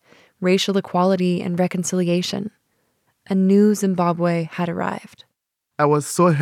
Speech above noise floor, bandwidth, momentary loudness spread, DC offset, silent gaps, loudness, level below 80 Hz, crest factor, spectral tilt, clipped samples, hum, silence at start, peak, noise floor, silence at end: 59 dB; 15 kHz; 10 LU; under 0.1%; none; -20 LUFS; -68 dBFS; 16 dB; -6 dB/octave; under 0.1%; none; 0.4 s; -4 dBFS; -77 dBFS; 0 s